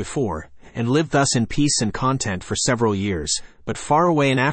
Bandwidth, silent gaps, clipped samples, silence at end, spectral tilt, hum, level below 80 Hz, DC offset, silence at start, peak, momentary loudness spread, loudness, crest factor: 8.8 kHz; none; under 0.1%; 0 s; -4.5 dB/octave; none; -44 dBFS; under 0.1%; 0 s; -6 dBFS; 9 LU; -20 LUFS; 14 dB